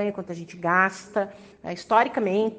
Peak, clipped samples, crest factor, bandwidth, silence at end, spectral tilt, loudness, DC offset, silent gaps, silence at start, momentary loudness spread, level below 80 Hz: -6 dBFS; under 0.1%; 20 dB; 9.4 kHz; 0 s; -5.5 dB/octave; -24 LUFS; under 0.1%; none; 0 s; 15 LU; -66 dBFS